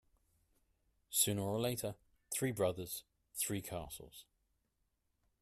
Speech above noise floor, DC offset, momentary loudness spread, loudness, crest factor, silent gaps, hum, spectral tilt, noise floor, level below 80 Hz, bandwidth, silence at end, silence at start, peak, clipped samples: 43 dB; under 0.1%; 17 LU; -38 LUFS; 26 dB; none; none; -3.5 dB/octave; -82 dBFS; -68 dBFS; 15.5 kHz; 1.2 s; 1.1 s; -16 dBFS; under 0.1%